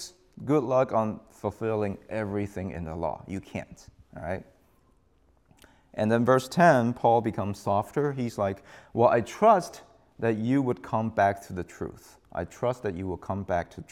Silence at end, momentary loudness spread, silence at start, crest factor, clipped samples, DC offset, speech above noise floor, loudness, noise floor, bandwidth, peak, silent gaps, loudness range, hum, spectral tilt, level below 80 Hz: 0.1 s; 17 LU; 0 s; 22 dB; under 0.1%; under 0.1%; 38 dB; -27 LUFS; -65 dBFS; 15 kHz; -6 dBFS; none; 11 LU; none; -7 dB/octave; -60 dBFS